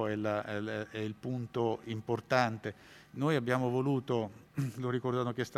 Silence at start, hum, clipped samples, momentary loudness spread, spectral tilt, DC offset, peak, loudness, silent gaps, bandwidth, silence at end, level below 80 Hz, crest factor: 0 s; none; under 0.1%; 9 LU; -7 dB/octave; under 0.1%; -12 dBFS; -34 LUFS; none; 14.5 kHz; 0 s; -72 dBFS; 22 dB